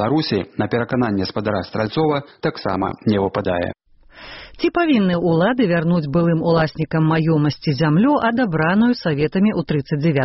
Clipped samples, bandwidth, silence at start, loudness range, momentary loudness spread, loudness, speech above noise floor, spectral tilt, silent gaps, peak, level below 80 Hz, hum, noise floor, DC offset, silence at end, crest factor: under 0.1%; 6 kHz; 0 s; 4 LU; 6 LU; -19 LUFS; 25 dB; -6 dB/octave; none; -4 dBFS; -48 dBFS; none; -43 dBFS; under 0.1%; 0 s; 14 dB